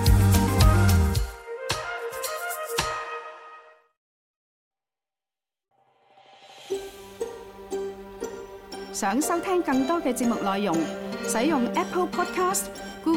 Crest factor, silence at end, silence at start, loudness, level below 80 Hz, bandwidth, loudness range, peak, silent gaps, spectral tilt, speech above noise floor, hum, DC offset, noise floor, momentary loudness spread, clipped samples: 20 dB; 0 s; 0 s; -26 LUFS; -34 dBFS; 16.5 kHz; 15 LU; -6 dBFS; 3.97-4.71 s; -5.5 dB/octave; over 65 dB; none; under 0.1%; under -90 dBFS; 17 LU; under 0.1%